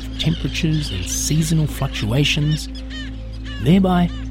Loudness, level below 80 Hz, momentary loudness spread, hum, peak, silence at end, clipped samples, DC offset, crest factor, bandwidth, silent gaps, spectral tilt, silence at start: -19 LUFS; -30 dBFS; 14 LU; none; -4 dBFS; 0 s; under 0.1%; under 0.1%; 16 dB; 16.5 kHz; none; -5 dB/octave; 0 s